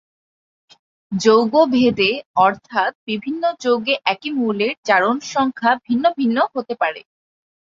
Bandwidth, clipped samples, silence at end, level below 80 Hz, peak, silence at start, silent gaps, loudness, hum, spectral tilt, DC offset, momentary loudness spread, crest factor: 7.6 kHz; under 0.1%; 0.65 s; -62 dBFS; -2 dBFS; 1.1 s; 2.26-2.34 s, 2.95-3.07 s, 4.77-4.83 s; -18 LUFS; none; -4.5 dB/octave; under 0.1%; 8 LU; 18 dB